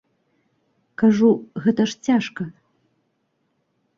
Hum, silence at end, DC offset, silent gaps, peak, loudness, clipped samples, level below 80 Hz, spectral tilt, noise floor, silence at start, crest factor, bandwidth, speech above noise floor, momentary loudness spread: none; 1.45 s; under 0.1%; none; -4 dBFS; -20 LUFS; under 0.1%; -64 dBFS; -6.5 dB/octave; -70 dBFS; 1 s; 18 dB; 7.4 kHz; 52 dB; 17 LU